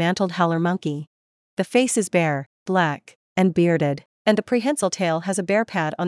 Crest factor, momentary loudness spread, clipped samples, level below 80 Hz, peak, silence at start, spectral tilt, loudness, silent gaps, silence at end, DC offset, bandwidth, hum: 18 dB; 9 LU; under 0.1%; -68 dBFS; -4 dBFS; 0 s; -5 dB/octave; -22 LUFS; 1.07-1.57 s, 2.46-2.66 s, 3.16-3.36 s, 4.06-4.25 s; 0 s; under 0.1%; 12 kHz; none